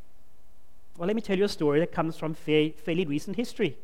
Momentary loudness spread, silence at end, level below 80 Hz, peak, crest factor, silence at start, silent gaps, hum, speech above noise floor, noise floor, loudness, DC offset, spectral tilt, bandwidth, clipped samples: 7 LU; 0.1 s; -56 dBFS; -10 dBFS; 18 dB; 0.95 s; none; none; 32 dB; -59 dBFS; -28 LUFS; 1%; -6.5 dB/octave; 16 kHz; under 0.1%